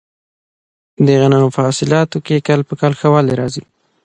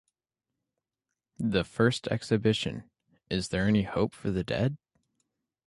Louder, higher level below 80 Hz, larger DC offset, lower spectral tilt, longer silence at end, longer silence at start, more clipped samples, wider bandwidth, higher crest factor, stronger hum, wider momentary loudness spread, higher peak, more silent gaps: first, -14 LUFS vs -29 LUFS; about the same, -52 dBFS vs -52 dBFS; neither; about the same, -6.5 dB/octave vs -6 dB/octave; second, 0.45 s vs 0.9 s; second, 1 s vs 1.4 s; neither; second, 9.6 kHz vs 11.5 kHz; second, 14 dB vs 20 dB; neither; about the same, 7 LU vs 8 LU; first, 0 dBFS vs -10 dBFS; neither